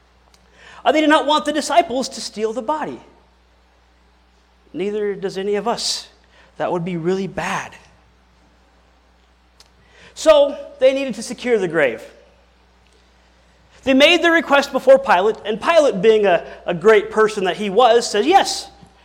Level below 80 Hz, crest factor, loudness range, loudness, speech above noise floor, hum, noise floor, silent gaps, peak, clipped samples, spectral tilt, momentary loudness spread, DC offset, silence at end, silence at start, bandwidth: -54 dBFS; 16 dB; 12 LU; -17 LUFS; 38 dB; none; -55 dBFS; none; -2 dBFS; under 0.1%; -3.5 dB/octave; 13 LU; under 0.1%; 0.35 s; 0.75 s; 16 kHz